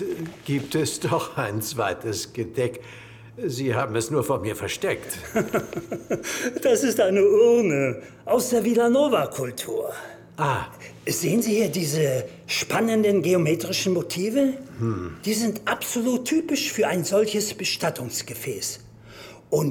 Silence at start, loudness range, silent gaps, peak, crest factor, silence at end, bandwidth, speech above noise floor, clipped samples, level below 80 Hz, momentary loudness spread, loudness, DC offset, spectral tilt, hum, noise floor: 0 s; 6 LU; none; -6 dBFS; 16 dB; 0 s; 19.5 kHz; 21 dB; under 0.1%; -58 dBFS; 11 LU; -24 LUFS; under 0.1%; -4.5 dB/octave; none; -44 dBFS